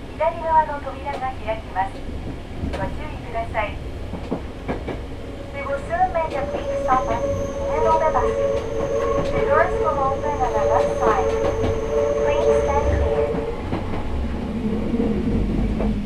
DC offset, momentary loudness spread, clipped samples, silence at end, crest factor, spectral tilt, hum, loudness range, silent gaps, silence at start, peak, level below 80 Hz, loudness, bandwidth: under 0.1%; 11 LU; under 0.1%; 0 s; 18 dB; -7 dB/octave; none; 8 LU; none; 0 s; -4 dBFS; -32 dBFS; -22 LUFS; 12 kHz